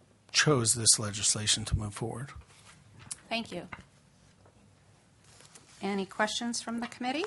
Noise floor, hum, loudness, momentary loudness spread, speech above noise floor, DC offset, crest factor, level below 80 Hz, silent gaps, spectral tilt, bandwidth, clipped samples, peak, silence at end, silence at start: -62 dBFS; none; -28 LUFS; 19 LU; 31 dB; under 0.1%; 24 dB; -52 dBFS; none; -2.5 dB/octave; 11.5 kHz; under 0.1%; -8 dBFS; 0 s; 0.35 s